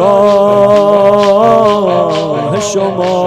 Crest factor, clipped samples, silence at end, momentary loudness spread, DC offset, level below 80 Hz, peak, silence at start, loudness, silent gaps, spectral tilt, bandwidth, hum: 8 dB; 2%; 0 s; 6 LU; under 0.1%; -46 dBFS; 0 dBFS; 0 s; -9 LUFS; none; -5.5 dB/octave; 12.5 kHz; none